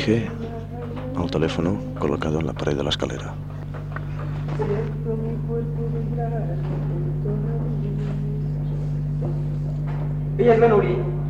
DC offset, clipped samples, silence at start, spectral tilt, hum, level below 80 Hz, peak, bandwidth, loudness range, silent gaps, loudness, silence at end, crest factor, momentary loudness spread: under 0.1%; under 0.1%; 0 s; -7.5 dB/octave; 50 Hz at -40 dBFS; -36 dBFS; -6 dBFS; 7.8 kHz; 4 LU; none; -24 LUFS; 0 s; 18 dB; 11 LU